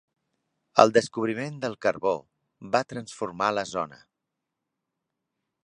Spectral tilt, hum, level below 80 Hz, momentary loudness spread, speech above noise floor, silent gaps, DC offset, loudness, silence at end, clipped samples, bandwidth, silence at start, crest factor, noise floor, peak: -4.5 dB/octave; none; -68 dBFS; 14 LU; 58 dB; none; under 0.1%; -26 LUFS; 1.7 s; under 0.1%; 11 kHz; 0.75 s; 28 dB; -84 dBFS; 0 dBFS